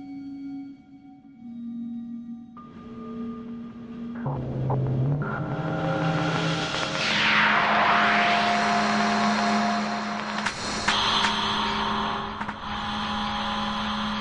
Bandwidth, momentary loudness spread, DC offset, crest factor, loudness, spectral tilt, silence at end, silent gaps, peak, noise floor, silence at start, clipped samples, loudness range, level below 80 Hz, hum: 11 kHz; 18 LU; under 0.1%; 16 dB; -24 LUFS; -4.5 dB/octave; 0 s; none; -10 dBFS; -48 dBFS; 0 s; under 0.1%; 16 LU; -50 dBFS; none